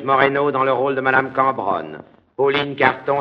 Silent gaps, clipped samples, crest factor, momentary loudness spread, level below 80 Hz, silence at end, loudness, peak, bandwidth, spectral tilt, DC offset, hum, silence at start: none; under 0.1%; 18 dB; 8 LU; -60 dBFS; 0 s; -18 LUFS; 0 dBFS; 5.8 kHz; -7.5 dB/octave; under 0.1%; none; 0 s